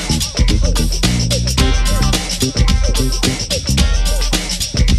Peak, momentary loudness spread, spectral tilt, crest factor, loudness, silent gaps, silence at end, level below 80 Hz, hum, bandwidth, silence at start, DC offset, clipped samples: -2 dBFS; 2 LU; -4 dB/octave; 12 dB; -16 LUFS; none; 0 s; -16 dBFS; none; 14.5 kHz; 0 s; under 0.1%; under 0.1%